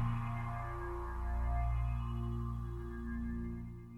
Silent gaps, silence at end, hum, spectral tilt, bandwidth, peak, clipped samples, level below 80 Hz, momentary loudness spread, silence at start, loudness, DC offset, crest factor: none; 0 s; none; -9 dB/octave; 4.2 kHz; -26 dBFS; under 0.1%; -40 dBFS; 6 LU; 0 s; -40 LUFS; under 0.1%; 12 dB